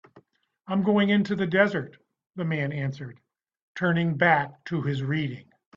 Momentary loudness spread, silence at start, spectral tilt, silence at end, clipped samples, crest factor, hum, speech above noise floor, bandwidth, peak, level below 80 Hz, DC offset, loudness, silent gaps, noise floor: 20 LU; 0.15 s; -8 dB/octave; 0.35 s; under 0.1%; 20 dB; none; 37 dB; 7.2 kHz; -6 dBFS; -64 dBFS; under 0.1%; -25 LUFS; 3.62-3.75 s; -62 dBFS